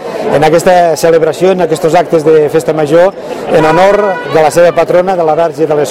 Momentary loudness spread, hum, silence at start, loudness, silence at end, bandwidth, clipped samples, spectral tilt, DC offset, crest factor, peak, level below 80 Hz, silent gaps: 4 LU; none; 0 s; -8 LUFS; 0 s; 16 kHz; 2%; -5.5 dB/octave; under 0.1%; 8 dB; 0 dBFS; -42 dBFS; none